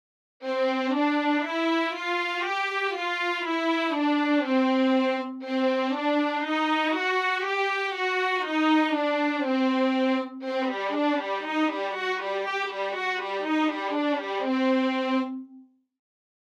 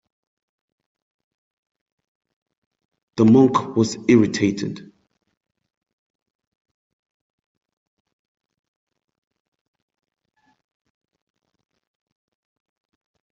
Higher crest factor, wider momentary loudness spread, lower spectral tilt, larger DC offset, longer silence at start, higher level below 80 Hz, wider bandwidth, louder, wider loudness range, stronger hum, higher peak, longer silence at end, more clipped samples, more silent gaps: second, 14 dB vs 22 dB; second, 5 LU vs 17 LU; second, -3 dB/octave vs -6.5 dB/octave; neither; second, 0.4 s vs 3.15 s; second, under -90 dBFS vs -64 dBFS; first, 9.8 kHz vs 7.6 kHz; second, -26 LUFS vs -18 LUFS; second, 3 LU vs 8 LU; neither; second, -12 dBFS vs -4 dBFS; second, 0.8 s vs 8.55 s; neither; neither